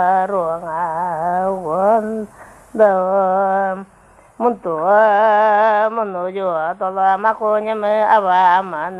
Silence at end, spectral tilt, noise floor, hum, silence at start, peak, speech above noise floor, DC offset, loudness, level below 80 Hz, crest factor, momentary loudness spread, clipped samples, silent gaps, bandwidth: 0 s; -6.5 dB/octave; -38 dBFS; none; 0 s; -2 dBFS; 23 dB; under 0.1%; -16 LUFS; -58 dBFS; 16 dB; 9 LU; under 0.1%; none; 11.5 kHz